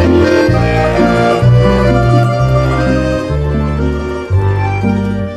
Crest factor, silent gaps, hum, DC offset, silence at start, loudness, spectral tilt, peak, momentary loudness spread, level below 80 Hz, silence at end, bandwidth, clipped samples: 10 dB; none; none; under 0.1%; 0 s; -12 LUFS; -8 dB/octave; 0 dBFS; 6 LU; -22 dBFS; 0 s; 10.5 kHz; under 0.1%